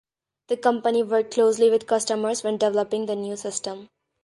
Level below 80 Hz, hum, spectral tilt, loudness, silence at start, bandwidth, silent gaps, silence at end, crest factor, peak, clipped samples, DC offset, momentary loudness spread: -72 dBFS; none; -3.5 dB/octave; -23 LUFS; 0.5 s; 11.5 kHz; none; 0.4 s; 18 dB; -6 dBFS; under 0.1%; under 0.1%; 10 LU